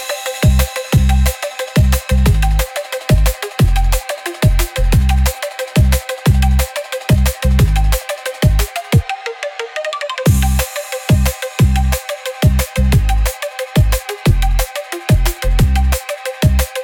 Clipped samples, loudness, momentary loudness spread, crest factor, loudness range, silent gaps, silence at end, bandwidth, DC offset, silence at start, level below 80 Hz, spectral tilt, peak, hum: under 0.1%; -16 LUFS; 8 LU; 12 dB; 2 LU; none; 0 s; 18.5 kHz; under 0.1%; 0 s; -16 dBFS; -5.5 dB/octave; -2 dBFS; none